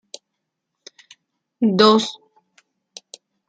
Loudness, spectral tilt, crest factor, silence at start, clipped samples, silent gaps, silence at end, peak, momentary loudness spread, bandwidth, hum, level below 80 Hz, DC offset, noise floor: -17 LUFS; -5 dB/octave; 22 dB; 1.6 s; under 0.1%; none; 1.35 s; -2 dBFS; 27 LU; 9.2 kHz; none; -70 dBFS; under 0.1%; -79 dBFS